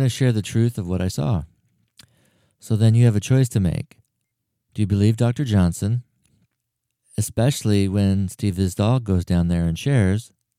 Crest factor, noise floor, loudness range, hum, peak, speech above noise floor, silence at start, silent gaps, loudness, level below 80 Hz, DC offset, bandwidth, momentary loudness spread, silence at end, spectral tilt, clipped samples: 16 dB; -78 dBFS; 3 LU; none; -4 dBFS; 59 dB; 0 s; none; -21 LUFS; -44 dBFS; under 0.1%; 15.5 kHz; 9 LU; 0.35 s; -7 dB/octave; under 0.1%